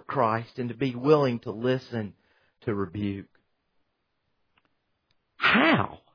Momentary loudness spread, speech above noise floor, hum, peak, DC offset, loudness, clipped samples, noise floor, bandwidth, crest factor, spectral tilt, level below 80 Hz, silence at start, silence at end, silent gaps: 15 LU; 50 dB; none; -6 dBFS; under 0.1%; -26 LUFS; under 0.1%; -76 dBFS; 5.4 kHz; 22 dB; -7.5 dB/octave; -64 dBFS; 0.1 s; 0.2 s; none